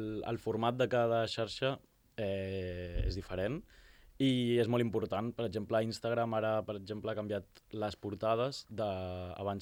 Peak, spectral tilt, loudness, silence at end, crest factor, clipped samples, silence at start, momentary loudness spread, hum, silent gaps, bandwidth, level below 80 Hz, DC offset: -18 dBFS; -6.5 dB/octave; -35 LUFS; 0 s; 16 dB; under 0.1%; 0 s; 9 LU; none; none; 16.5 kHz; -52 dBFS; under 0.1%